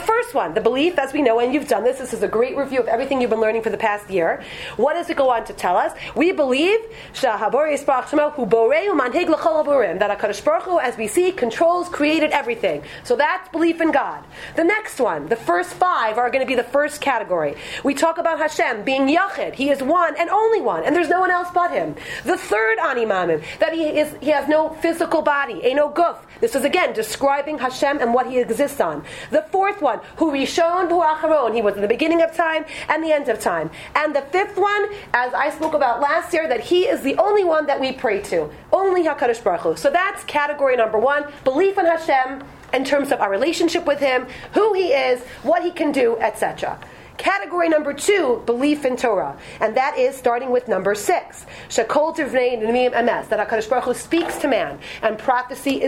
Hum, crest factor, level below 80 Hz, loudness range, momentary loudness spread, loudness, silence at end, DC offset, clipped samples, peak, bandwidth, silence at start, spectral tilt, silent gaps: none; 18 dB; -52 dBFS; 2 LU; 5 LU; -19 LUFS; 0 s; under 0.1%; under 0.1%; -2 dBFS; 16 kHz; 0 s; -4 dB/octave; none